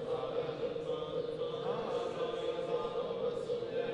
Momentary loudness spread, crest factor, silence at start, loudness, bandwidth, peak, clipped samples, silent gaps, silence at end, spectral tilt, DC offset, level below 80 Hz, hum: 2 LU; 14 dB; 0 s; -37 LUFS; 10 kHz; -24 dBFS; under 0.1%; none; 0 s; -6 dB/octave; under 0.1%; -66 dBFS; none